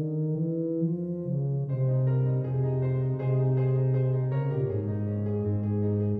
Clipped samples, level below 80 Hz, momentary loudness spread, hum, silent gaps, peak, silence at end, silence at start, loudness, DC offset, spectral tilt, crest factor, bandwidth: under 0.1%; -58 dBFS; 4 LU; none; none; -16 dBFS; 0 s; 0 s; -28 LUFS; under 0.1%; -13 dB/octave; 10 dB; 3 kHz